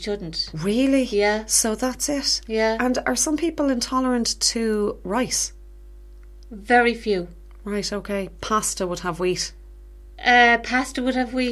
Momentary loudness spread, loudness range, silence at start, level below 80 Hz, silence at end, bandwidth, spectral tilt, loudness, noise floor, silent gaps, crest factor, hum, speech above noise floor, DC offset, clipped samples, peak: 10 LU; 4 LU; 0 s; -42 dBFS; 0 s; 15 kHz; -2.5 dB/octave; -21 LUFS; -42 dBFS; none; 20 dB; 50 Hz at -40 dBFS; 20 dB; under 0.1%; under 0.1%; -4 dBFS